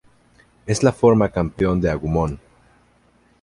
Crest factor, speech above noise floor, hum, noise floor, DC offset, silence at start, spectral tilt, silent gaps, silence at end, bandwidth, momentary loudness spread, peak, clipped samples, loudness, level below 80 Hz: 20 dB; 39 dB; 60 Hz at -45 dBFS; -58 dBFS; under 0.1%; 0.65 s; -7 dB/octave; none; 1.05 s; 11.5 kHz; 11 LU; -2 dBFS; under 0.1%; -19 LUFS; -38 dBFS